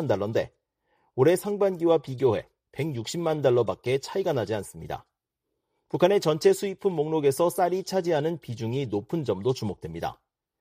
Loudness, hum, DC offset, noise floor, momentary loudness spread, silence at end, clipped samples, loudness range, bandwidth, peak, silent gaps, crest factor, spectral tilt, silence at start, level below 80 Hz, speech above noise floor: -26 LUFS; none; under 0.1%; -83 dBFS; 12 LU; 0.45 s; under 0.1%; 3 LU; 15.5 kHz; -6 dBFS; none; 20 dB; -6 dB/octave; 0 s; -62 dBFS; 57 dB